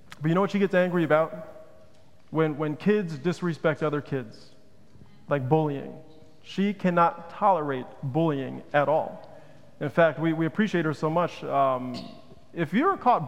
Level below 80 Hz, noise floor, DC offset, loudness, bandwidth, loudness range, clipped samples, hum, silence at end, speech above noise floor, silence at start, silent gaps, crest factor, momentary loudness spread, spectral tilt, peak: -66 dBFS; -57 dBFS; 0.4%; -26 LUFS; 11 kHz; 3 LU; under 0.1%; none; 0 s; 32 dB; 0.2 s; none; 20 dB; 13 LU; -7.5 dB/octave; -6 dBFS